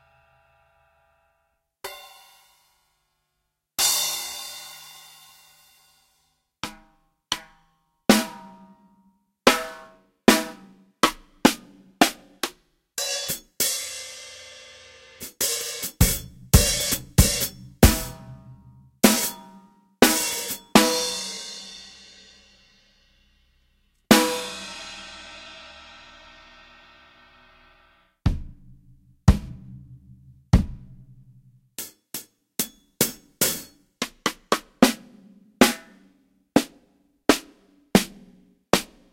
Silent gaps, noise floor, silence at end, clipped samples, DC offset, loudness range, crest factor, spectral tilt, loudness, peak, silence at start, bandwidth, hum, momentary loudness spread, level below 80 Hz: none; -78 dBFS; 0.3 s; under 0.1%; under 0.1%; 10 LU; 26 dB; -3.5 dB/octave; -23 LUFS; 0 dBFS; 1.85 s; 16 kHz; none; 23 LU; -36 dBFS